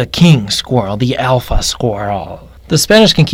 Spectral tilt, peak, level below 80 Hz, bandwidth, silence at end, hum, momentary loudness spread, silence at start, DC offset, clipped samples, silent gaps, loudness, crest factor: -5 dB/octave; 0 dBFS; -26 dBFS; 16.5 kHz; 0 s; none; 12 LU; 0 s; under 0.1%; 0.6%; none; -12 LUFS; 12 dB